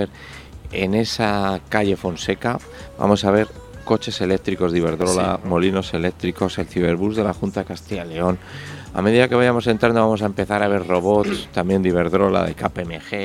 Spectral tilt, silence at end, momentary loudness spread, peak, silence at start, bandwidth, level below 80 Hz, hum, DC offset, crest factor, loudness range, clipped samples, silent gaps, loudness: -6 dB/octave; 0 s; 12 LU; 0 dBFS; 0 s; 15 kHz; -44 dBFS; none; under 0.1%; 20 dB; 4 LU; under 0.1%; none; -20 LUFS